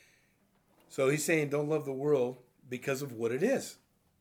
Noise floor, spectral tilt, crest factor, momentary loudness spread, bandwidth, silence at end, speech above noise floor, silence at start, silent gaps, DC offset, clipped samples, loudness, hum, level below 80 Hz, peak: -70 dBFS; -5 dB/octave; 18 dB; 14 LU; 18.5 kHz; 0.45 s; 39 dB; 0.9 s; none; under 0.1%; under 0.1%; -32 LUFS; none; -82 dBFS; -14 dBFS